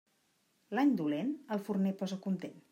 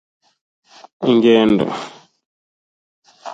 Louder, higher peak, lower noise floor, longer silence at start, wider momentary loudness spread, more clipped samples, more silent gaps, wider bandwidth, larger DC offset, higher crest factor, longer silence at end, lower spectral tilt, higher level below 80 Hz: second, -34 LUFS vs -15 LUFS; second, -20 dBFS vs -2 dBFS; second, -75 dBFS vs under -90 dBFS; second, 0.7 s vs 1 s; second, 8 LU vs 21 LU; neither; second, none vs 2.26-3.02 s; first, 16 kHz vs 7.8 kHz; neither; about the same, 16 dB vs 18 dB; about the same, 0.1 s vs 0 s; about the same, -7.5 dB/octave vs -6.5 dB/octave; second, -86 dBFS vs -56 dBFS